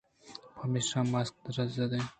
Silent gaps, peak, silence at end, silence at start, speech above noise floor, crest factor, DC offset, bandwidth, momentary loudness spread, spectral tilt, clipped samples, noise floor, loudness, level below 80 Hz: none; -18 dBFS; 0.05 s; 0.25 s; 20 dB; 16 dB; under 0.1%; 9.4 kHz; 18 LU; -5 dB/octave; under 0.1%; -52 dBFS; -33 LUFS; -66 dBFS